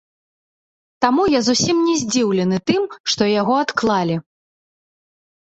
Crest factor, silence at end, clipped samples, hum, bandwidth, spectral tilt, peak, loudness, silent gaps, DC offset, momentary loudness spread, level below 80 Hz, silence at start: 18 dB; 1.25 s; under 0.1%; none; 8.2 kHz; -4 dB/octave; -2 dBFS; -18 LUFS; 3.00-3.04 s; under 0.1%; 5 LU; -54 dBFS; 1 s